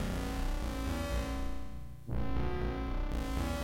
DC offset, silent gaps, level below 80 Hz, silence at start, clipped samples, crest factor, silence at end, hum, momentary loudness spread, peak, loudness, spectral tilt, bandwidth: under 0.1%; none; -38 dBFS; 0 s; under 0.1%; 12 dB; 0 s; 60 Hz at -45 dBFS; 7 LU; -22 dBFS; -38 LUFS; -6 dB/octave; 16 kHz